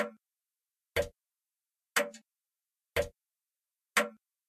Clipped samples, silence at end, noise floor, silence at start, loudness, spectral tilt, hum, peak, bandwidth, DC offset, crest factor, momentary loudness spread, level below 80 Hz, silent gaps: under 0.1%; 0.35 s; under -90 dBFS; 0 s; -34 LUFS; -2.5 dB/octave; none; -12 dBFS; 14 kHz; under 0.1%; 26 dB; 9 LU; -58 dBFS; none